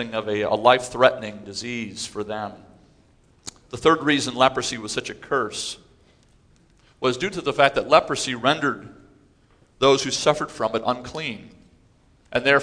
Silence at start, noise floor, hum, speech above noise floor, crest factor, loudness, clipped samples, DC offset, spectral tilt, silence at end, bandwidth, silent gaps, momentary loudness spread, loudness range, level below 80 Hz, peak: 0 s; -58 dBFS; none; 36 dB; 24 dB; -22 LUFS; under 0.1%; under 0.1%; -3.5 dB/octave; 0 s; 11 kHz; none; 14 LU; 4 LU; -56 dBFS; 0 dBFS